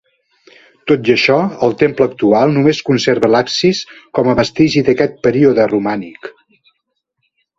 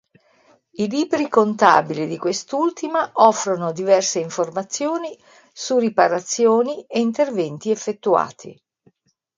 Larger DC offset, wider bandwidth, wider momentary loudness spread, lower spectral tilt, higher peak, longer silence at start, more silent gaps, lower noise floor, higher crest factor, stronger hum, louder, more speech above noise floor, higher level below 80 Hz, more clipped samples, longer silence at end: neither; second, 7.8 kHz vs 9.6 kHz; about the same, 10 LU vs 9 LU; first, -5.5 dB/octave vs -4 dB/octave; about the same, 0 dBFS vs 0 dBFS; about the same, 0.85 s vs 0.8 s; neither; first, -71 dBFS vs -61 dBFS; second, 14 dB vs 20 dB; neither; first, -13 LUFS vs -19 LUFS; first, 58 dB vs 42 dB; first, -48 dBFS vs -70 dBFS; neither; first, 1.3 s vs 0.85 s